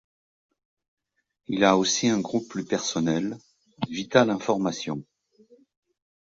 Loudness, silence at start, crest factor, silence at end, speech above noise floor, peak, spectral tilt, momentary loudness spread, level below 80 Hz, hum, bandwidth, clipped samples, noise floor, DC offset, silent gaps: -25 LUFS; 1.5 s; 24 dB; 1.3 s; 34 dB; -4 dBFS; -4 dB/octave; 13 LU; -64 dBFS; none; 7.8 kHz; under 0.1%; -59 dBFS; under 0.1%; none